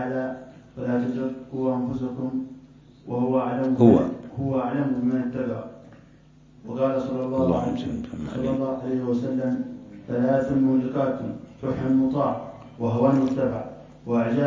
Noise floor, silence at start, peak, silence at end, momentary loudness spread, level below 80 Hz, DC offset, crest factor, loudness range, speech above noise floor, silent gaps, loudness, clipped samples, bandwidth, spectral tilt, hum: -52 dBFS; 0 s; -2 dBFS; 0 s; 13 LU; -52 dBFS; under 0.1%; 22 dB; 4 LU; 29 dB; none; -25 LUFS; under 0.1%; 7.4 kHz; -9 dB/octave; none